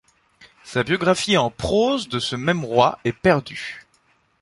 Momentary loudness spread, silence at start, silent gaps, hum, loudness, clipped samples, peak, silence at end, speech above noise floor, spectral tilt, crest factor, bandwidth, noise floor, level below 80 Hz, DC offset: 12 LU; 0.65 s; none; none; -20 LUFS; under 0.1%; -2 dBFS; 0.6 s; 42 dB; -5 dB/octave; 20 dB; 11.5 kHz; -62 dBFS; -48 dBFS; under 0.1%